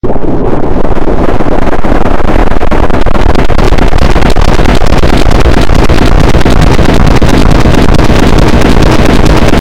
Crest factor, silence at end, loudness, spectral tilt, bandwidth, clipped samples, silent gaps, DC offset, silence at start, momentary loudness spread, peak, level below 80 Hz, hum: 2 dB; 0 s; -8 LUFS; -6.5 dB/octave; 10.5 kHz; 30%; none; 8%; 0 s; 5 LU; 0 dBFS; -8 dBFS; none